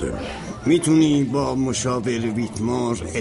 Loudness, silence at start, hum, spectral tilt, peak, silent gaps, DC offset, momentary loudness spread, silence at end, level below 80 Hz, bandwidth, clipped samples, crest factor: -21 LUFS; 0 s; none; -5.5 dB/octave; -6 dBFS; none; under 0.1%; 10 LU; 0 s; -42 dBFS; 11.5 kHz; under 0.1%; 16 dB